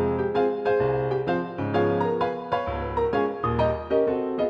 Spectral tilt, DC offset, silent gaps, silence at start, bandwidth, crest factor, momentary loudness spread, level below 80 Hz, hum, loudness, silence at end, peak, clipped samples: -9 dB/octave; under 0.1%; none; 0 s; 6.2 kHz; 14 dB; 4 LU; -44 dBFS; none; -25 LUFS; 0 s; -10 dBFS; under 0.1%